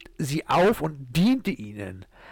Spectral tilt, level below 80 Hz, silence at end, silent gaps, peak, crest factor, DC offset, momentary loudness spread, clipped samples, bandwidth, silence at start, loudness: -6 dB/octave; -50 dBFS; 0 s; none; -16 dBFS; 10 dB; under 0.1%; 17 LU; under 0.1%; 19 kHz; 0 s; -24 LUFS